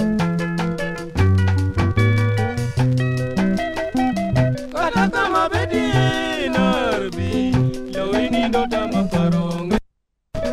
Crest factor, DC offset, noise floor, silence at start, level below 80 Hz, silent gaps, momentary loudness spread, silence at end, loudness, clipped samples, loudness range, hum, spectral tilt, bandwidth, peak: 16 dB; under 0.1%; -64 dBFS; 0 s; -36 dBFS; none; 5 LU; 0 s; -20 LUFS; under 0.1%; 1 LU; none; -7 dB/octave; 13.5 kHz; -4 dBFS